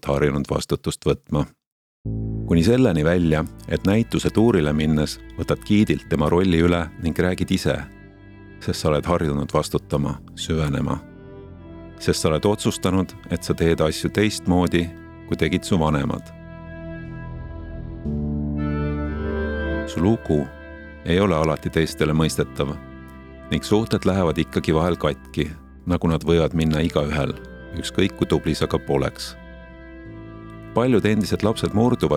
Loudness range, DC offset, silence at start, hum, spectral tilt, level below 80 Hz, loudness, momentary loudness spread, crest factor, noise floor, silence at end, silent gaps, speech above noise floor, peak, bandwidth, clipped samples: 5 LU; under 0.1%; 0.05 s; none; -6 dB/octave; -36 dBFS; -22 LUFS; 17 LU; 18 dB; -43 dBFS; 0 s; 1.67-2.04 s; 23 dB; -2 dBFS; 15.5 kHz; under 0.1%